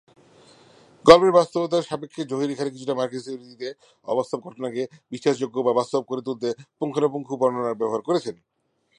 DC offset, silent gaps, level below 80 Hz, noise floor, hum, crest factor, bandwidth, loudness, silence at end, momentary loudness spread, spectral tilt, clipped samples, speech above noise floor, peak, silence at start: under 0.1%; none; -60 dBFS; -53 dBFS; none; 24 dB; 10.5 kHz; -23 LUFS; 0.65 s; 16 LU; -5.5 dB/octave; under 0.1%; 30 dB; 0 dBFS; 1.05 s